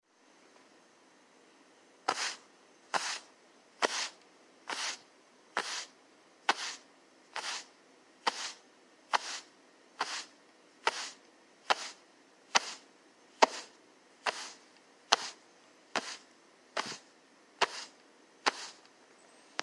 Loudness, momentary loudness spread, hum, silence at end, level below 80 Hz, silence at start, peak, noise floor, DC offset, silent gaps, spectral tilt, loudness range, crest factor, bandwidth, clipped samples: -35 LUFS; 18 LU; none; 0 s; under -90 dBFS; 2.1 s; -4 dBFS; -64 dBFS; under 0.1%; none; 0.5 dB/octave; 5 LU; 36 dB; 11.5 kHz; under 0.1%